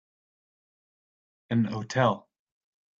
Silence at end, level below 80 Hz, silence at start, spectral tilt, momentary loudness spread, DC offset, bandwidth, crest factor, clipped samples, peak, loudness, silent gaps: 0.8 s; -68 dBFS; 1.5 s; -6.5 dB/octave; 5 LU; under 0.1%; 7.6 kHz; 24 dB; under 0.1%; -8 dBFS; -28 LUFS; none